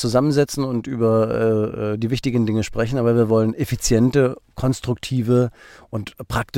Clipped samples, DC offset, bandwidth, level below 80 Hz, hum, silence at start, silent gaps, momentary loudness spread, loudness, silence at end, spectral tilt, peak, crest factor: under 0.1%; under 0.1%; 16.5 kHz; -40 dBFS; none; 0 s; none; 9 LU; -20 LUFS; 0 s; -6.5 dB/octave; -4 dBFS; 14 dB